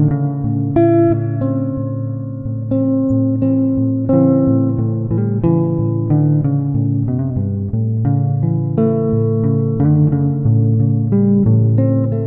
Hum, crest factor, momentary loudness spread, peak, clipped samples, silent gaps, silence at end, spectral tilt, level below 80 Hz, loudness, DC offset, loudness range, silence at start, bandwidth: none; 14 dB; 6 LU; 0 dBFS; under 0.1%; none; 0 s; -14.5 dB/octave; -40 dBFS; -16 LUFS; under 0.1%; 2 LU; 0 s; 2.5 kHz